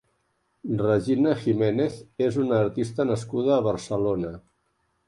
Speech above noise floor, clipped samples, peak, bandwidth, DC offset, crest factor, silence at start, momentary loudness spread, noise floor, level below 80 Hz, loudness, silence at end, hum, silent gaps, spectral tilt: 48 dB; under 0.1%; -8 dBFS; 11.5 kHz; under 0.1%; 16 dB; 0.65 s; 7 LU; -72 dBFS; -56 dBFS; -25 LUFS; 0.7 s; none; none; -7.5 dB/octave